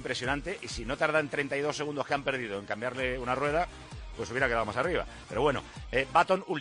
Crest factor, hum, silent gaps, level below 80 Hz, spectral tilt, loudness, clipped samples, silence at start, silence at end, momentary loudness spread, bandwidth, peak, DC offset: 20 dB; none; none; -48 dBFS; -4.5 dB/octave; -31 LUFS; under 0.1%; 0 s; 0 s; 10 LU; 10 kHz; -10 dBFS; under 0.1%